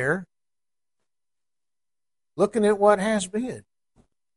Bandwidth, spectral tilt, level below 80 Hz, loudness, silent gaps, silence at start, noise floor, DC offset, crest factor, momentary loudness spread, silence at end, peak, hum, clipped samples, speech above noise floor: 11.5 kHz; -5 dB/octave; -64 dBFS; -23 LUFS; none; 0 s; under -90 dBFS; under 0.1%; 22 dB; 17 LU; 0.75 s; -4 dBFS; none; under 0.1%; over 68 dB